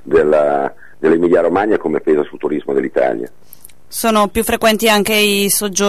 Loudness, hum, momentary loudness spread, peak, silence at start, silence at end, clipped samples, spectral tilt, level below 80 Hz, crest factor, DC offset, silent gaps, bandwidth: -14 LUFS; none; 8 LU; -2 dBFS; 0.05 s; 0 s; under 0.1%; -3.5 dB/octave; -42 dBFS; 12 dB; 2%; none; 14 kHz